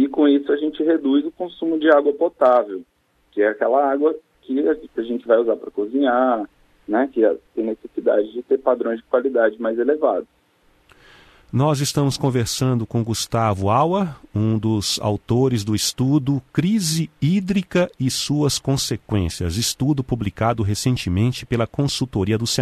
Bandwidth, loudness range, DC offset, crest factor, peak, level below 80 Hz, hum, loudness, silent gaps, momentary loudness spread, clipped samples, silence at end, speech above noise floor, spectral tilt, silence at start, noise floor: 13.5 kHz; 3 LU; under 0.1%; 18 dB; -2 dBFS; -46 dBFS; none; -20 LUFS; none; 7 LU; under 0.1%; 0 s; 39 dB; -5.5 dB/octave; 0 s; -59 dBFS